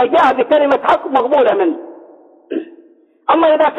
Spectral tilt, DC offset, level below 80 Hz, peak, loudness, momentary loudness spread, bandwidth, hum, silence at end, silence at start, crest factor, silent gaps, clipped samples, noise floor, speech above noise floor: -5.5 dB/octave; under 0.1%; -58 dBFS; -2 dBFS; -13 LUFS; 14 LU; 7.4 kHz; none; 0 s; 0 s; 12 dB; none; under 0.1%; -47 dBFS; 35 dB